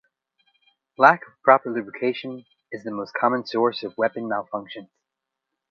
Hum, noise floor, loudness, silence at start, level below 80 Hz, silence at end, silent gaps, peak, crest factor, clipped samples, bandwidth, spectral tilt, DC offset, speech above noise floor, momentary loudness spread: none; -84 dBFS; -22 LUFS; 1 s; -74 dBFS; 0.85 s; none; 0 dBFS; 24 dB; under 0.1%; 6.6 kHz; -6.5 dB/octave; under 0.1%; 61 dB; 20 LU